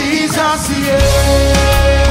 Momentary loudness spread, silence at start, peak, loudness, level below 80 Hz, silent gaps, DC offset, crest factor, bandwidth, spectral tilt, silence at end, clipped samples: 3 LU; 0 s; 0 dBFS; -12 LUFS; -16 dBFS; none; under 0.1%; 10 dB; 16.5 kHz; -4.5 dB/octave; 0 s; under 0.1%